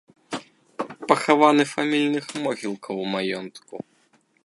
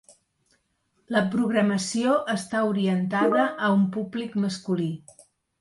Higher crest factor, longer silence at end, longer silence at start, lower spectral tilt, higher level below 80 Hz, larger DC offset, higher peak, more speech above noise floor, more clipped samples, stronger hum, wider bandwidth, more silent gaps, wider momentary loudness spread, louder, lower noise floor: first, 24 dB vs 16 dB; about the same, 0.7 s vs 0.65 s; second, 0.3 s vs 1.1 s; about the same, -4.5 dB/octave vs -5.5 dB/octave; second, -74 dBFS vs -68 dBFS; neither; first, 0 dBFS vs -8 dBFS; second, 41 dB vs 47 dB; neither; neither; about the same, 11.5 kHz vs 11.5 kHz; neither; first, 22 LU vs 6 LU; about the same, -22 LUFS vs -24 LUFS; second, -63 dBFS vs -71 dBFS